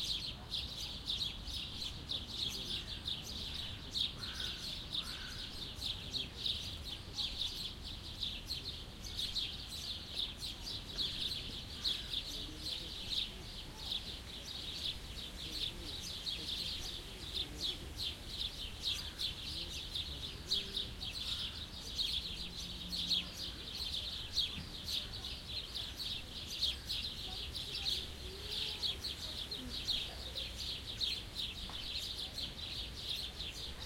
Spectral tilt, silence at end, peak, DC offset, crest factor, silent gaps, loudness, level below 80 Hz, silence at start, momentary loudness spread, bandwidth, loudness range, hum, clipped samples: -2.5 dB/octave; 0 s; -22 dBFS; under 0.1%; 20 dB; none; -40 LUFS; -52 dBFS; 0 s; 7 LU; 16.5 kHz; 2 LU; none; under 0.1%